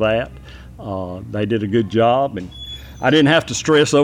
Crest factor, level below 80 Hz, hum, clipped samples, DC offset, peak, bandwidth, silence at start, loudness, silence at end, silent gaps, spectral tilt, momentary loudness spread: 14 dB; -42 dBFS; none; under 0.1%; under 0.1%; -2 dBFS; 14.5 kHz; 0 s; -17 LUFS; 0 s; none; -5 dB/octave; 17 LU